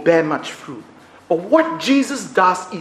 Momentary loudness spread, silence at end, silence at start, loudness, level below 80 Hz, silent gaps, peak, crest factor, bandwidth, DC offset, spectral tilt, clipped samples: 17 LU; 0 s; 0 s; -17 LUFS; -66 dBFS; none; 0 dBFS; 18 dB; 13.5 kHz; under 0.1%; -4.5 dB/octave; under 0.1%